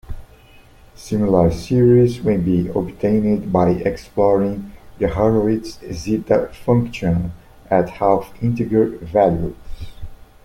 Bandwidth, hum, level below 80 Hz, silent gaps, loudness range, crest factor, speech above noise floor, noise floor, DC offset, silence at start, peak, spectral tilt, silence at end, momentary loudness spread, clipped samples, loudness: 16 kHz; none; -38 dBFS; none; 3 LU; 18 dB; 29 dB; -46 dBFS; under 0.1%; 0.1 s; -2 dBFS; -8.5 dB/octave; 0.3 s; 14 LU; under 0.1%; -18 LUFS